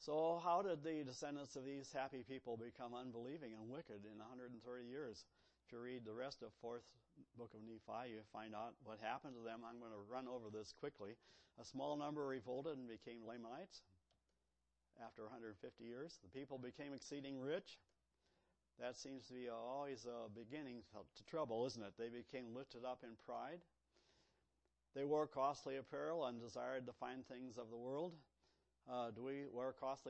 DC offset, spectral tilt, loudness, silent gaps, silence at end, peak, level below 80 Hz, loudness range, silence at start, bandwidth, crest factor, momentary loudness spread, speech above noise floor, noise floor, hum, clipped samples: under 0.1%; -5.5 dB/octave; -50 LUFS; none; 0 s; -30 dBFS; -86 dBFS; 8 LU; 0 s; 8.2 kHz; 22 dB; 13 LU; 40 dB; -89 dBFS; none; under 0.1%